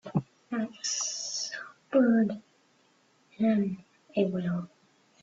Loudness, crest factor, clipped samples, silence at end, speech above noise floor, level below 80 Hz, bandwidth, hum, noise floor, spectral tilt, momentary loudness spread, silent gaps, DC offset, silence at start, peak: -30 LUFS; 18 dB; under 0.1%; 0.55 s; 40 dB; -72 dBFS; 8 kHz; none; -66 dBFS; -4.5 dB/octave; 13 LU; none; under 0.1%; 0.05 s; -12 dBFS